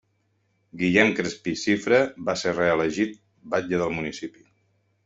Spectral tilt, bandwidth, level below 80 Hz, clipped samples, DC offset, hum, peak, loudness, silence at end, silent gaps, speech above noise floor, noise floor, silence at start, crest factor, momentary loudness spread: -5 dB/octave; 8 kHz; -60 dBFS; under 0.1%; under 0.1%; none; -4 dBFS; -24 LUFS; 0.75 s; none; 46 dB; -70 dBFS; 0.75 s; 22 dB; 10 LU